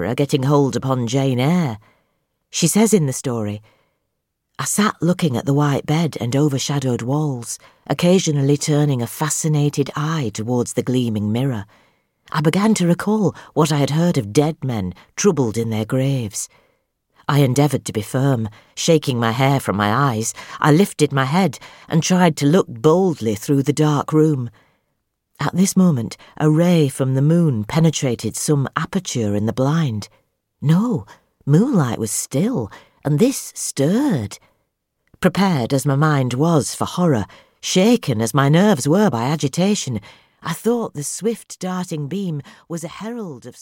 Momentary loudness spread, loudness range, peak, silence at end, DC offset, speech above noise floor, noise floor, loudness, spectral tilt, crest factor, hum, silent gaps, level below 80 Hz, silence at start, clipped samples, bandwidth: 11 LU; 4 LU; -2 dBFS; 0.1 s; under 0.1%; 57 dB; -74 dBFS; -18 LUFS; -5.5 dB/octave; 16 dB; none; none; -56 dBFS; 0 s; under 0.1%; 17 kHz